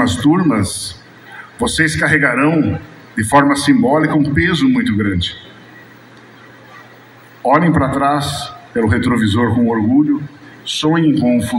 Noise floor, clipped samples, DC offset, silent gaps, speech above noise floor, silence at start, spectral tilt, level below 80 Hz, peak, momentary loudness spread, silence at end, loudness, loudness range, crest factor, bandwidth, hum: -41 dBFS; under 0.1%; under 0.1%; none; 28 dB; 0 s; -5.5 dB/octave; -42 dBFS; 0 dBFS; 11 LU; 0 s; -14 LUFS; 5 LU; 16 dB; 15.5 kHz; none